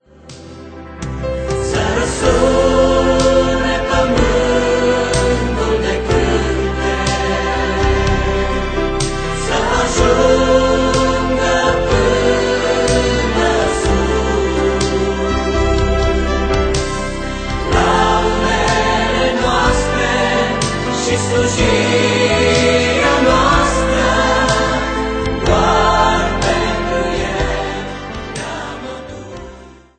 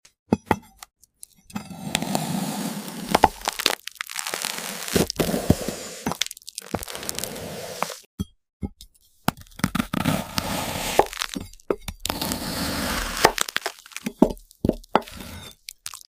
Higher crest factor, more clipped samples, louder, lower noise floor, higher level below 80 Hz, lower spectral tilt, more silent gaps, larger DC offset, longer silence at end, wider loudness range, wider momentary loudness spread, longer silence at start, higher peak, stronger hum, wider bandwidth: second, 14 dB vs 26 dB; neither; first, -15 LUFS vs -26 LUFS; second, -38 dBFS vs -51 dBFS; first, -24 dBFS vs -44 dBFS; about the same, -4.5 dB/octave vs -3.5 dB/octave; second, none vs 8.06-8.18 s, 8.53-8.60 s; neither; first, 0.25 s vs 0.1 s; second, 3 LU vs 6 LU; second, 9 LU vs 15 LU; about the same, 0.25 s vs 0.3 s; about the same, 0 dBFS vs 0 dBFS; neither; second, 9.4 kHz vs 16 kHz